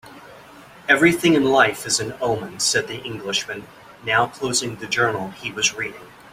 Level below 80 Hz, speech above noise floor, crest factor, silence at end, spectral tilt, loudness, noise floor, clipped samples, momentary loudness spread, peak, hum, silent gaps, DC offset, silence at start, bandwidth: -56 dBFS; 23 dB; 20 dB; 0.25 s; -3 dB/octave; -20 LUFS; -44 dBFS; under 0.1%; 14 LU; -2 dBFS; none; none; under 0.1%; 0.05 s; 16 kHz